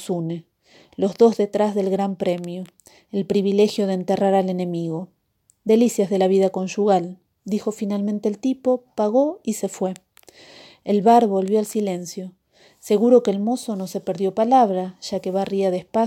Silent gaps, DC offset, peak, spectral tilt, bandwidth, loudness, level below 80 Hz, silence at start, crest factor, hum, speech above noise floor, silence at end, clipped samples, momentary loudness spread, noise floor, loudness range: none; under 0.1%; -4 dBFS; -6.5 dB/octave; 16 kHz; -21 LUFS; -68 dBFS; 0 s; 18 dB; none; 42 dB; 0 s; under 0.1%; 15 LU; -62 dBFS; 3 LU